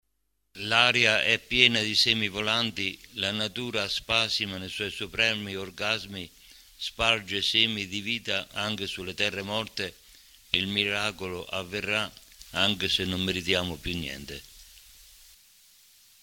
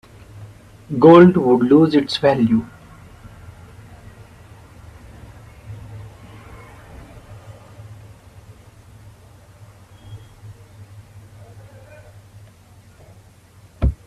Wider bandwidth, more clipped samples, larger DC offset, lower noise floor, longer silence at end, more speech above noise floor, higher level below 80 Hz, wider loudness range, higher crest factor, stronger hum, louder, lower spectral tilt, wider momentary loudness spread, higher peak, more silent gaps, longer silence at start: first, 17 kHz vs 11.5 kHz; neither; neither; first, -78 dBFS vs -48 dBFS; first, 1.45 s vs 0.1 s; first, 49 dB vs 35 dB; second, -54 dBFS vs -38 dBFS; second, 7 LU vs 28 LU; first, 26 dB vs 20 dB; neither; second, -26 LUFS vs -14 LUFS; second, -3 dB/octave vs -8 dB/octave; second, 14 LU vs 31 LU; about the same, -2 dBFS vs 0 dBFS; neither; first, 0.55 s vs 0.4 s